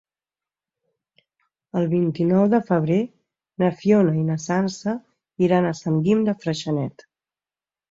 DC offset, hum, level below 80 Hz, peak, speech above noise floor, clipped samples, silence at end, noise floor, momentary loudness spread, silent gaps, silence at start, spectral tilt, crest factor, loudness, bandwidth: under 0.1%; none; -62 dBFS; -6 dBFS; over 70 dB; under 0.1%; 1 s; under -90 dBFS; 10 LU; none; 1.75 s; -7.5 dB/octave; 16 dB; -21 LUFS; 7.8 kHz